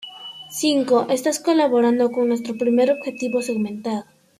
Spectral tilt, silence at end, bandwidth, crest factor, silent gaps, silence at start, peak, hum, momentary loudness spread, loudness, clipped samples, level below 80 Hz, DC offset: -4 dB/octave; 0.35 s; 15.5 kHz; 14 dB; none; 0 s; -6 dBFS; none; 11 LU; -20 LUFS; under 0.1%; -68 dBFS; under 0.1%